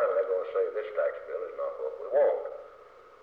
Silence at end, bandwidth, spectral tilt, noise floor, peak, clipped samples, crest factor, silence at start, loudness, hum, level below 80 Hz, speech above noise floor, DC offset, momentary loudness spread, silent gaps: 0.05 s; 4.5 kHz; -5 dB/octave; -53 dBFS; -16 dBFS; under 0.1%; 14 dB; 0 s; -30 LUFS; none; -74 dBFS; 23 dB; under 0.1%; 13 LU; none